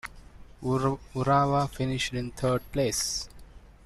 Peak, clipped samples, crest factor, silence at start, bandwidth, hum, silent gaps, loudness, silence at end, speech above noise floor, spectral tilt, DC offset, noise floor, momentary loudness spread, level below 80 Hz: -12 dBFS; under 0.1%; 18 dB; 0.05 s; 13.5 kHz; none; none; -28 LUFS; 0.15 s; 21 dB; -4.5 dB/octave; under 0.1%; -49 dBFS; 10 LU; -48 dBFS